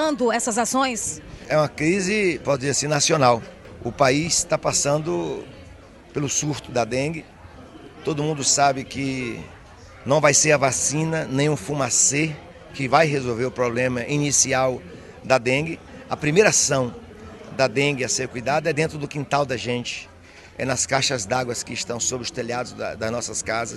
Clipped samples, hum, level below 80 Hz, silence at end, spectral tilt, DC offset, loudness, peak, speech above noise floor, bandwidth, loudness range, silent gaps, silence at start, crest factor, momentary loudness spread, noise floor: under 0.1%; none; -52 dBFS; 0 s; -3.5 dB/octave; under 0.1%; -21 LUFS; -2 dBFS; 23 dB; 12.5 kHz; 5 LU; none; 0 s; 20 dB; 16 LU; -45 dBFS